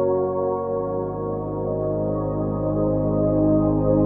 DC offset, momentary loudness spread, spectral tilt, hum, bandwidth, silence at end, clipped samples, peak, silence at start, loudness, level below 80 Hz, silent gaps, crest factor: under 0.1%; 7 LU; -14.5 dB/octave; none; 2.2 kHz; 0 s; under 0.1%; -8 dBFS; 0 s; -23 LUFS; -38 dBFS; none; 14 dB